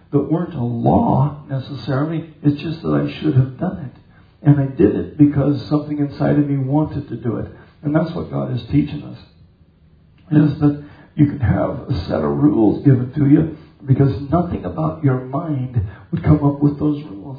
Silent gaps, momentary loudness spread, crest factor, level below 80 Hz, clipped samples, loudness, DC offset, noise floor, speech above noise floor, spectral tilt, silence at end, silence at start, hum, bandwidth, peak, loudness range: none; 11 LU; 18 dB; -42 dBFS; under 0.1%; -18 LUFS; under 0.1%; -51 dBFS; 34 dB; -11.5 dB/octave; 0 s; 0.1 s; none; 5 kHz; 0 dBFS; 5 LU